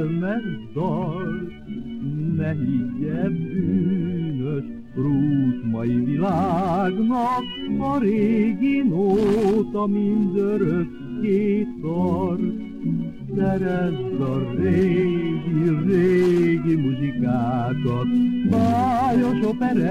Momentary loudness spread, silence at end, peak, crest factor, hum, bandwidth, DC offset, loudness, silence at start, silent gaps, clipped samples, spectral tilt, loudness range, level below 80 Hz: 8 LU; 0 s; -8 dBFS; 14 dB; none; 10 kHz; 0.6%; -22 LUFS; 0 s; none; under 0.1%; -9 dB/octave; 4 LU; -48 dBFS